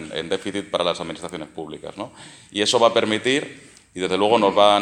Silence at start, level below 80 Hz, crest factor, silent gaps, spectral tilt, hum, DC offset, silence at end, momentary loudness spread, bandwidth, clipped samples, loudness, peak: 0 s; -60 dBFS; 22 dB; none; -3.5 dB/octave; none; under 0.1%; 0 s; 18 LU; 12 kHz; under 0.1%; -20 LUFS; 0 dBFS